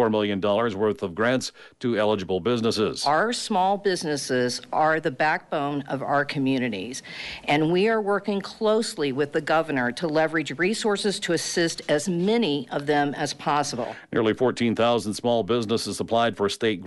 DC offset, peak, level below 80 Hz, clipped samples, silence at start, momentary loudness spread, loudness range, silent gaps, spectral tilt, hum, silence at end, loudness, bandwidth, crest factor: under 0.1%; -10 dBFS; -62 dBFS; under 0.1%; 0 s; 5 LU; 1 LU; none; -4.5 dB/octave; none; 0 s; -24 LUFS; 11.5 kHz; 14 dB